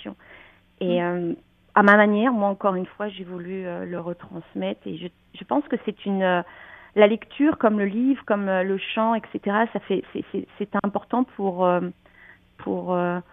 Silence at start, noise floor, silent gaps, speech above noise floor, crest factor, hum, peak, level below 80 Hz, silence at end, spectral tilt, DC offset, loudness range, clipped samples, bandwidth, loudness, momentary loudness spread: 0 s; -52 dBFS; none; 29 dB; 24 dB; none; 0 dBFS; -64 dBFS; 0.1 s; -8.5 dB/octave; under 0.1%; 7 LU; under 0.1%; 4.1 kHz; -23 LUFS; 15 LU